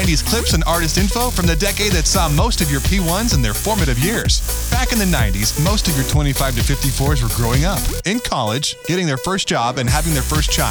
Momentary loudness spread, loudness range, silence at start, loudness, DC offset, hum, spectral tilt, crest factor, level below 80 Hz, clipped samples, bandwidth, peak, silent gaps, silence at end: 3 LU; 2 LU; 0 s; -17 LUFS; under 0.1%; none; -4 dB/octave; 16 dB; -22 dBFS; under 0.1%; over 20 kHz; 0 dBFS; none; 0 s